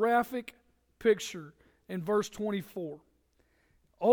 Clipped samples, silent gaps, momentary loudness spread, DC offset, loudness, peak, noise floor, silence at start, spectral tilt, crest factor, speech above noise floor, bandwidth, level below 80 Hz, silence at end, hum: under 0.1%; none; 18 LU; under 0.1%; -33 LUFS; -12 dBFS; -70 dBFS; 0 s; -5 dB/octave; 20 dB; 39 dB; over 20 kHz; -68 dBFS; 0 s; none